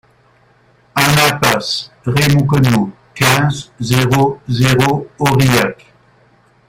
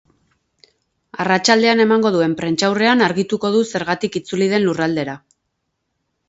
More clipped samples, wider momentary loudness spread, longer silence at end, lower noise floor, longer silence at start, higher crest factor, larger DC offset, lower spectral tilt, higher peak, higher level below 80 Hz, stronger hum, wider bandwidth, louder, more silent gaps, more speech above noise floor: neither; about the same, 9 LU vs 10 LU; second, 0.95 s vs 1.1 s; second, -51 dBFS vs -73 dBFS; second, 0.95 s vs 1.15 s; about the same, 14 dB vs 18 dB; neither; about the same, -5 dB/octave vs -4.5 dB/octave; about the same, 0 dBFS vs 0 dBFS; first, -42 dBFS vs -60 dBFS; neither; first, 17 kHz vs 8 kHz; first, -13 LUFS vs -17 LUFS; neither; second, 38 dB vs 57 dB